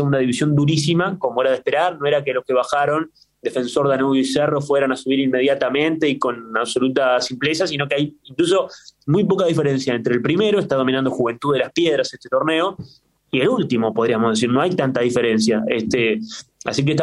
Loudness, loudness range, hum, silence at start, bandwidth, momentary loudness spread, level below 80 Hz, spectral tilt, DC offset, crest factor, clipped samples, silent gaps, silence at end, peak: -19 LUFS; 1 LU; none; 0 s; 12 kHz; 5 LU; -58 dBFS; -5.5 dB/octave; under 0.1%; 16 dB; under 0.1%; none; 0 s; -2 dBFS